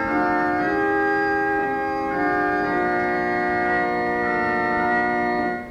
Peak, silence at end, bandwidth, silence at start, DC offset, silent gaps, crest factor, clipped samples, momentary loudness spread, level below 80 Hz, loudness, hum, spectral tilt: -8 dBFS; 0 s; 15 kHz; 0 s; under 0.1%; none; 12 dB; under 0.1%; 2 LU; -48 dBFS; -21 LUFS; none; -7 dB/octave